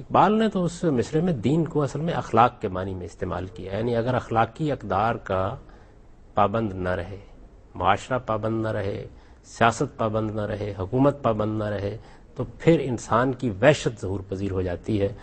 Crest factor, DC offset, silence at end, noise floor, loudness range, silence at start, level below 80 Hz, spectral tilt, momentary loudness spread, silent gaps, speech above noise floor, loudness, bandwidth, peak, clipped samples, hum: 22 dB; under 0.1%; 0 s; -49 dBFS; 3 LU; 0 s; -46 dBFS; -6.5 dB/octave; 12 LU; none; 25 dB; -25 LUFS; 8.8 kHz; -2 dBFS; under 0.1%; none